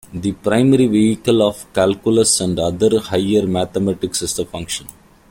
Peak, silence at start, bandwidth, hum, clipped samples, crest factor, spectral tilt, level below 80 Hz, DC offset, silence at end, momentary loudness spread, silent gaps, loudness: -2 dBFS; 0.1 s; 16.5 kHz; none; under 0.1%; 14 dB; -5 dB/octave; -46 dBFS; under 0.1%; 0.4 s; 10 LU; none; -17 LUFS